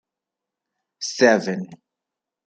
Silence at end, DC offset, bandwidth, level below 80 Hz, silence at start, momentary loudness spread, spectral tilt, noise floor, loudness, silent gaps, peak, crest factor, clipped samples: 0.7 s; under 0.1%; 9 kHz; -72 dBFS; 1 s; 15 LU; -4 dB/octave; -86 dBFS; -20 LUFS; none; -2 dBFS; 24 dB; under 0.1%